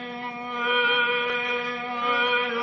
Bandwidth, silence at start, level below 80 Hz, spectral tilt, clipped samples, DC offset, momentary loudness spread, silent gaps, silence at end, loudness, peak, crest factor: 6.6 kHz; 0 s; -70 dBFS; -3.5 dB/octave; under 0.1%; under 0.1%; 10 LU; none; 0 s; -24 LUFS; -12 dBFS; 14 dB